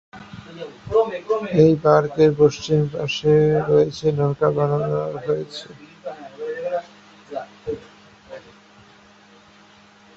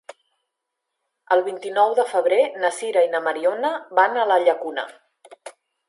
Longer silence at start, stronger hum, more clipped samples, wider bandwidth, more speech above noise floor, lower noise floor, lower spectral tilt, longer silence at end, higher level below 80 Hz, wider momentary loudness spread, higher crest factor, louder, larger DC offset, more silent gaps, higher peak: second, 0.15 s vs 1.3 s; neither; neither; second, 7.6 kHz vs 11.5 kHz; second, 31 dB vs 61 dB; second, -50 dBFS vs -81 dBFS; first, -7 dB/octave vs -2.5 dB/octave; first, 1.8 s vs 0.4 s; first, -52 dBFS vs -84 dBFS; first, 21 LU vs 7 LU; about the same, 20 dB vs 20 dB; about the same, -20 LUFS vs -20 LUFS; neither; neither; about the same, -2 dBFS vs -2 dBFS